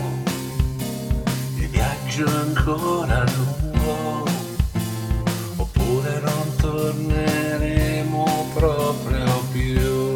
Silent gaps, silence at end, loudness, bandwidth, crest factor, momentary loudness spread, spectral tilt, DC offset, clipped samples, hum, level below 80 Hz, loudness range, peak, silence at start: none; 0 s; -22 LUFS; 18.5 kHz; 18 dB; 4 LU; -6 dB/octave; under 0.1%; under 0.1%; none; -28 dBFS; 2 LU; -4 dBFS; 0 s